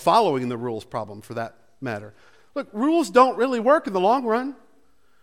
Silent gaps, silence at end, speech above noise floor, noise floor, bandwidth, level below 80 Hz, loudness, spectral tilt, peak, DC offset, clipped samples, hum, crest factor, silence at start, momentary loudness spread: none; 0.7 s; 41 dB; -63 dBFS; 15.5 kHz; -66 dBFS; -22 LUFS; -5.5 dB/octave; -4 dBFS; 0.2%; under 0.1%; none; 20 dB; 0 s; 16 LU